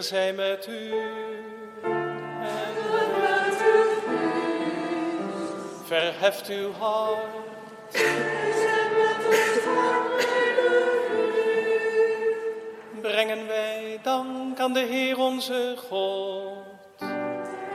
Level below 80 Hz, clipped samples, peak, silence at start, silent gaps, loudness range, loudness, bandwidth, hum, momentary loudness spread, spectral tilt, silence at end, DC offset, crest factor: -78 dBFS; under 0.1%; -8 dBFS; 0 s; none; 5 LU; -25 LUFS; 15.5 kHz; none; 12 LU; -3.5 dB/octave; 0 s; under 0.1%; 18 dB